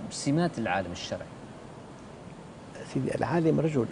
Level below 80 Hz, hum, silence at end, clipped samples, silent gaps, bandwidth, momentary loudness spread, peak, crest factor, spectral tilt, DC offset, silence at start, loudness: -58 dBFS; none; 0 s; under 0.1%; none; 10.5 kHz; 20 LU; -12 dBFS; 18 dB; -6 dB/octave; under 0.1%; 0 s; -29 LUFS